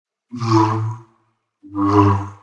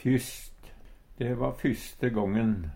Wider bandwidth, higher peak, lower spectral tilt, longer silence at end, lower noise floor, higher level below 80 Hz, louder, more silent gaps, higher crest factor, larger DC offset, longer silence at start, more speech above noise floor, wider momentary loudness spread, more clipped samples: second, 7.8 kHz vs 17 kHz; first, 0 dBFS vs -14 dBFS; first, -8 dB/octave vs -6.5 dB/octave; about the same, 0.05 s vs 0 s; first, -65 dBFS vs -49 dBFS; second, -60 dBFS vs -46 dBFS; first, -18 LUFS vs -30 LUFS; neither; about the same, 18 dB vs 16 dB; neither; first, 0.3 s vs 0 s; first, 49 dB vs 21 dB; first, 18 LU vs 13 LU; neither